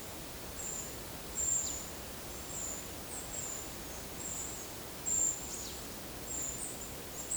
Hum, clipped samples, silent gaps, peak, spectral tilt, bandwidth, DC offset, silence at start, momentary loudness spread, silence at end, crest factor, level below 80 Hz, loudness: none; under 0.1%; none; -22 dBFS; -1.5 dB/octave; over 20 kHz; under 0.1%; 0 s; 11 LU; 0 s; 18 dB; -54 dBFS; -37 LUFS